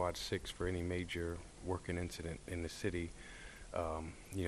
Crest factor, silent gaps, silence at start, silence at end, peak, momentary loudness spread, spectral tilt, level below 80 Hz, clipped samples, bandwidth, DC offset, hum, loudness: 18 dB; none; 0 s; 0 s; -24 dBFS; 7 LU; -5 dB/octave; -54 dBFS; under 0.1%; 13 kHz; under 0.1%; none; -42 LUFS